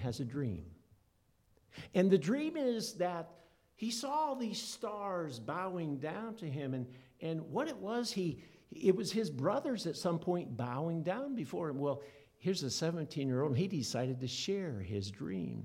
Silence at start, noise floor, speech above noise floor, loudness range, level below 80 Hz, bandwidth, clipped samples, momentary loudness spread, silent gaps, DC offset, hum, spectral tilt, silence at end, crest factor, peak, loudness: 0 s; -73 dBFS; 36 dB; 4 LU; -70 dBFS; 16.5 kHz; under 0.1%; 9 LU; none; under 0.1%; none; -5.5 dB/octave; 0 s; 22 dB; -16 dBFS; -37 LUFS